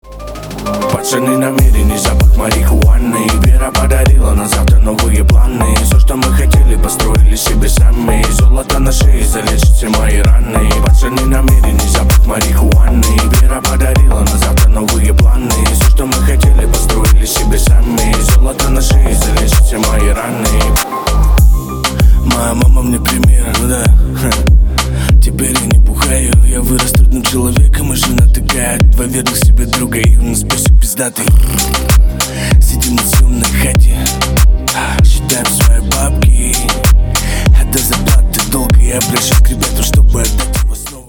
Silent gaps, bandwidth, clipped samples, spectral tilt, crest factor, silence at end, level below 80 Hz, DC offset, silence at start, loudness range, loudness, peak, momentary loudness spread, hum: none; over 20 kHz; under 0.1%; -4.5 dB/octave; 8 dB; 0.05 s; -10 dBFS; under 0.1%; 0.05 s; 1 LU; -11 LUFS; 0 dBFS; 3 LU; none